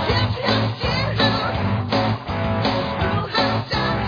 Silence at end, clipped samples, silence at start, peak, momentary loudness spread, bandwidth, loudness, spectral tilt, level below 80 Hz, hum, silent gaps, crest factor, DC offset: 0 s; under 0.1%; 0 s; -6 dBFS; 4 LU; 5.2 kHz; -21 LUFS; -6.5 dB/octave; -36 dBFS; none; none; 14 dB; under 0.1%